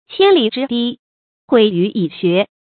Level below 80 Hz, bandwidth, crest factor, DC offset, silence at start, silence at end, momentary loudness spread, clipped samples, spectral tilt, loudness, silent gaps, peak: -62 dBFS; 4.7 kHz; 16 dB; under 0.1%; 0.1 s; 0.3 s; 7 LU; under 0.1%; -9 dB/octave; -15 LUFS; 0.99-1.48 s; 0 dBFS